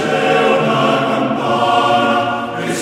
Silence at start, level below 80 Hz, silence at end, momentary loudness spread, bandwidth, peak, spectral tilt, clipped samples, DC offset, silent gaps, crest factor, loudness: 0 s; -58 dBFS; 0 s; 5 LU; 14.5 kHz; -2 dBFS; -5 dB/octave; under 0.1%; under 0.1%; none; 12 dB; -14 LUFS